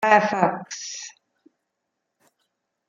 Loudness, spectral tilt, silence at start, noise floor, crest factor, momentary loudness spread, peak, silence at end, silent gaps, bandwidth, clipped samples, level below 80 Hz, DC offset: -23 LUFS; -4 dB/octave; 0 s; -80 dBFS; 24 dB; 18 LU; -2 dBFS; 1.8 s; none; 7.4 kHz; under 0.1%; -70 dBFS; under 0.1%